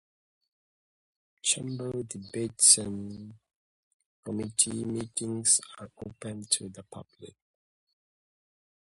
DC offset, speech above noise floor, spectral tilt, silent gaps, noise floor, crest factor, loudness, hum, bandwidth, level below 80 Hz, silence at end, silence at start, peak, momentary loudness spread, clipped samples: under 0.1%; over 60 dB; -2 dB/octave; 3.55-4.00 s, 4.06-4.23 s; under -90 dBFS; 28 dB; -26 LUFS; none; 12 kHz; -66 dBFS; 1.7 s; 1.45 s; -6 dBFS; 25 LU; under 0.1%